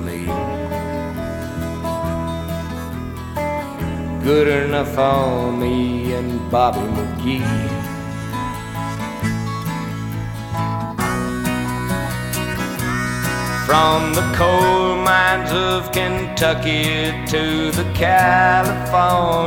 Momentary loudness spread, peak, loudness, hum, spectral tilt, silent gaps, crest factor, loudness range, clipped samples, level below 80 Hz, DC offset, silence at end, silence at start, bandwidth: 11 LU; 0 dBFS; -19 LUFS; none; -5 dB/octave; none; 18 dB; 8 LU; under 0.1%; -36 dBFS; under 0.1%; 0 s; 0 s; 19 kHz